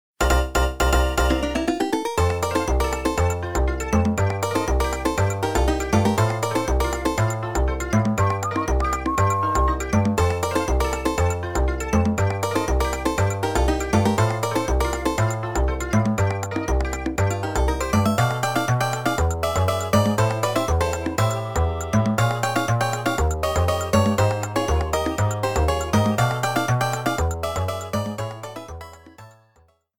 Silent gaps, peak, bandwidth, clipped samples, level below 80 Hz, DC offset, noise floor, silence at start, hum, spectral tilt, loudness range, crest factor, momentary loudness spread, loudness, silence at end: none; -4 dBFS; 18.5 kHz; under 0.1%; -28 dBFS; 0.3%; -60 dBFS; 0.2 s; none; -5.5 dB/octave; 1 LU; 16 dB; 4 LU; -22 LUFS; 0.7 s